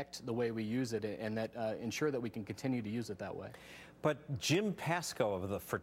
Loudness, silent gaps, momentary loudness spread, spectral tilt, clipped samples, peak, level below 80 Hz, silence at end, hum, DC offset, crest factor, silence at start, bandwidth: -38 LUFS; none; 10 LU; -5 dB/octave; under 0.1%; -18 dBFS; -70 dBFS; 0 s; none; under 0.1%; 20 dB; 0 s; 16.5 kHz